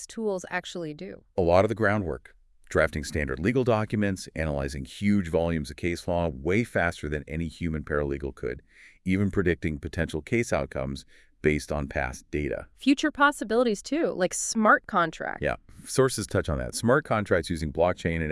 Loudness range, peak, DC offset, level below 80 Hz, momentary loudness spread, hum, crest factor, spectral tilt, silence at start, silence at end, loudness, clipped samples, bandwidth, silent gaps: 5 LU; -6 dBFS; under 0.1%; -44 dBFS; 11 LU; none; 20 dB; -5.5 dB/octave; 0 s; 0 s; -27 LUFS; under 0.1%; 12 kHz; none